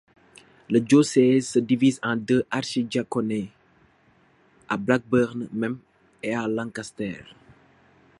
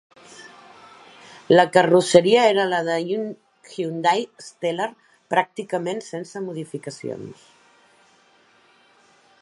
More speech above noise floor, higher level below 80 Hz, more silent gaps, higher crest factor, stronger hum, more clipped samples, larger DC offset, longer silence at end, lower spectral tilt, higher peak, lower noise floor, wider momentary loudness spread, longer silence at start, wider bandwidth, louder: about the same, 37 dB vs 37 dB; first, -62 dBFS vs -72 dBFS; neither; about the same, 20 dB vs 22 dB; neither; neither; neither; second, 0.95 s vs 2.1 s; about the same, -5.5 dB/octave vs -4.5 dB/octave; second, -4 dBFS vs 0 dBFS; about the same, -60 dBFS vs -57 dBFS; second, 14 LU vs 20 LU; first, 0.7 s vs 0.4 s; about the same, 11.5 kHz vs 11.5 kHz; second, -24 LUFS vs -21 LUFS